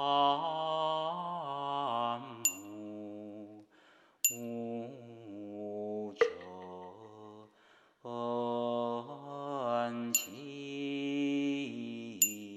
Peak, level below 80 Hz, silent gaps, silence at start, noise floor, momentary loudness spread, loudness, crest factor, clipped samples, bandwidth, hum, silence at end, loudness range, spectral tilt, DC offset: -10 dBFS; -88 dBFS; none; 0 s; -65 dBFS; 17 LU; -35 LUFS; 26 dB; under 0.1%; 14 kHz; none; 0 s; 6 LU; -2.5 dB/octave; under 0.1%